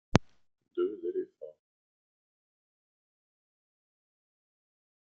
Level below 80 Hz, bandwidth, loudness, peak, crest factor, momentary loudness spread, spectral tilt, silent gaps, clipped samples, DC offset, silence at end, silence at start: -56 dBFS; 7.4 kHz; -35 LUFS; -2 dBFS; 36 dB; 19 LU; -6 dB/octave; none; under 0.1%; under 0.1%; 3.55 s; 0.15 s